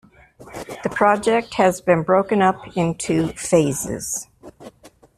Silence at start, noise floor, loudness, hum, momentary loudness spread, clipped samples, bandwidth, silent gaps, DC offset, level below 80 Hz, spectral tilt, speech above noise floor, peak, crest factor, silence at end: 0.4 s; -47 dBFS; -19 LUFS; none; 12 LU; under 0.1%; 15 kHz; none; under 0.1%; -50 dBFS; -5 dB/octave; 28 dB; -2 dBFS; 18 dB; 0.3 s